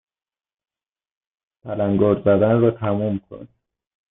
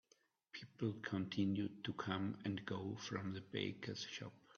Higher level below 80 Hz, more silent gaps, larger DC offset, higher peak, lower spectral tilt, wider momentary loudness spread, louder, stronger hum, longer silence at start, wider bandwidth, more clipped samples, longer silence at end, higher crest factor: first, -56 dBFS vs -80 dBFS; neither; neither; first, -6 dBFS vs -24 dBFS; first, -13 dB/octave vs -5.5 dB/octave; first, 11 LU vs 8 LU; first, -19 LUFS vs -44 LUFS; neither; first, 1.65 s vs 0.55 s; second, 3.9 kHz vs 7 kHz; neither; first, 0.7 s vs 0.05 s; about the same, 16 dB vs 20 dB